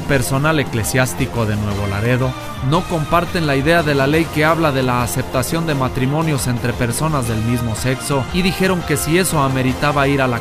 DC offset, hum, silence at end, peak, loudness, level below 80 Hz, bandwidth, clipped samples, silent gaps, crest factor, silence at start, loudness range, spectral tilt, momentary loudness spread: under 0.1%; none; 0 s; 0 dBFS; -17 LUFS; -34 dBFS; 16 kHz; under 0.1%; none; 16 dB; 0 s; 2 LU; -5 dB/octave; 5 LU